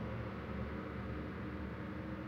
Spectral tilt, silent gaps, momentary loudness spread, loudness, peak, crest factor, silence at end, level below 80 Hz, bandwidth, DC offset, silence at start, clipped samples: -8.5 dB/octave; none; 1 LU; -44 LUFS; -30 dBFS; 12 dB; 0 s; -52 dBFS; 7.4 kHz; under 0.1%; 0 s; under 0.1%